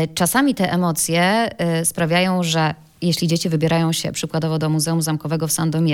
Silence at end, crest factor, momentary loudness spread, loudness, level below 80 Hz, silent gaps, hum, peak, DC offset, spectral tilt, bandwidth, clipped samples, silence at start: 0 s; 16 dB; 5 LU; -19 LUFS; -54 dBFS; none; none; -4 dBFS; under 0.1%; -4.5 dB/octave; 17 kHz; under 0.1%; 0 s